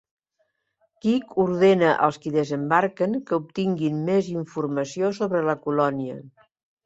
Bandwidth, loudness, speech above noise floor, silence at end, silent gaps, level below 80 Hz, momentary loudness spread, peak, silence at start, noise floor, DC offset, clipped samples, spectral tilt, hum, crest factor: 8 kHz; -23 LUFS; 50 dB; 0.55 s; none; -66 dBFS; 9 LU; -4 dBFS; 1.05 s; -73 dBFS; under 0.1%; under 0.1%; -7 dB/octave; none; 20 dB